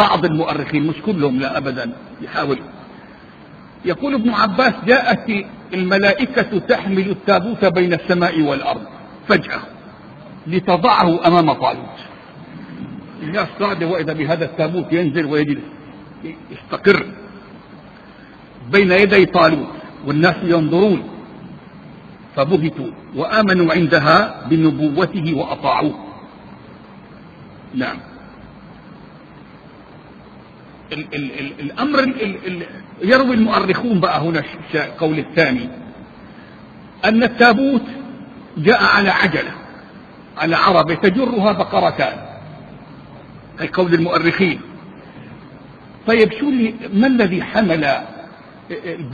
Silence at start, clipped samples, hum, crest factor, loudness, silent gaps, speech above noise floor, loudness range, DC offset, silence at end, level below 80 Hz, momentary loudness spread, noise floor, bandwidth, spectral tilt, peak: 0 s; under 0.1%; none; 18 dB; -16 LUFS; none; 25 dB; 8 LU; under 0.1%; 0 s; -50 dBFS; 22 LU; -41 dBFS; 7 kHz; -7.5 dB/octave; 0 dBFS